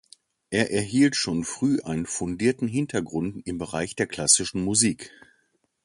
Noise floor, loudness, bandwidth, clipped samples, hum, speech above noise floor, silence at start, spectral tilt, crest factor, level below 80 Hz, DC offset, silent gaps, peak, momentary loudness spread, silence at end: -69 dBFS; -24 LUFS; 11.5 kHz; under 0.1%; none; 45 dB; 0.5 s; -3.5 dB/octave; 20 dB; -54 dBFS; under 0.1%; none; -6 dBFS; 11 LU; 0.75 s